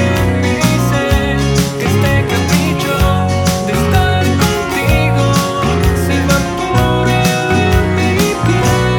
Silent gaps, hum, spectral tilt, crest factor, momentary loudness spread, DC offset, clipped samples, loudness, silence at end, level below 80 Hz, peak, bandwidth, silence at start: none; none; -5.5 dB/octave; 12 dB; 2 LU; under 0.1%; under 0.1%; -13 LUFS; 0 s; -24 dBFS; 0 dBFS; 19 kHz; 0 s